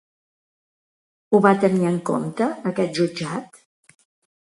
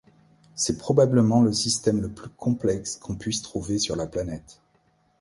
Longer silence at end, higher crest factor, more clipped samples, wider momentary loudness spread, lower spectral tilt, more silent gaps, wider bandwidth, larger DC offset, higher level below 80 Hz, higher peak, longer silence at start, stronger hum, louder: first, 0.95 s vs 0.7 s; about the same, 22 dB vs 20 dB; neither; about the same, 11 LU vs 13 LU; first, -6.5 dB/octave vs -5 dB/octave; neither; about the same, 11.5 kHz vs 11.5 kHz; neither; second, -66 dBFS vs -50 dBFS; first, -2 dBFS vs -6 dBFS; first, 1.3 s vs 0.55 s; neither; first, -21 LUFS vs -24 LUFS